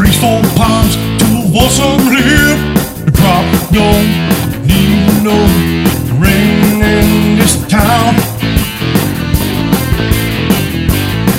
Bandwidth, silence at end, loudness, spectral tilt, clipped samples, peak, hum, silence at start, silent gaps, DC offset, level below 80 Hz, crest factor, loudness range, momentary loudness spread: 16.5 kHz; 0 s; -10 LUFS; -5 dB/octave; 0.7%; 0 dBFS; none; 0 s; none; 0.3%; -20 dBFS; 10 dB; 2 LU; 4 LU